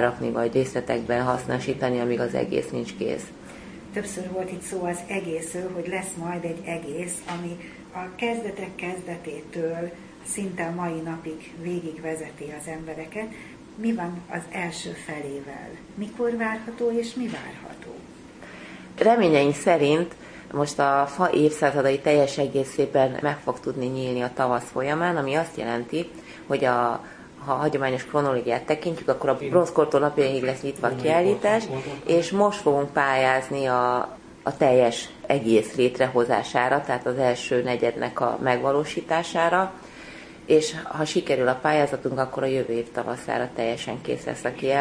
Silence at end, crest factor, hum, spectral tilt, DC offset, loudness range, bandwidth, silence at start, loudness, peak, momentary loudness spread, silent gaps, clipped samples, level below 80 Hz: 0 s; 20 dB; none; -5 dB/octave; under 0.1%; 9 LU; 10.5 kHz; 0 s; -25 LUFS; -4 dBFS; 15 LU; none; under 0.1%; -58 dBFS